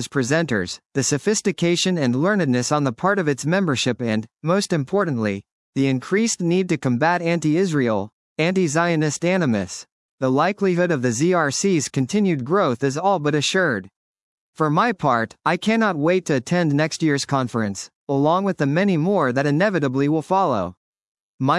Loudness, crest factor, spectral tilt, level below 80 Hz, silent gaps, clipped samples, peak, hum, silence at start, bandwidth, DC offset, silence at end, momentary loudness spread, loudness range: -20 LUFS; 16 dB; -5 dB/octave; -66 dBFS; 0.86-0.90 s, 5.52-5.73 s, 8.13-8.36 s, 9.92-10.18 s, 13.96-14.53 s, 17.95-18.07 s, 20.77-20.93 s, 21.01-21.39 s; under 0.1%; -4 dBFS; none; 0 s; 12 kHz; under 0.1%; 0 s; 6 LU; 1 LU